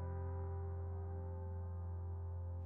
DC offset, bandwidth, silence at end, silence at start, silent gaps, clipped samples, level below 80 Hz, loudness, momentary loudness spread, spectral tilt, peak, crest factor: under 0.1%; 2.2 kHz; 0 s; 0 s; none; under 0.1%; -58 dBFS; -46 LUFS; 2 LU; -8.5 dB/octave; -36 dBFS; 8 dB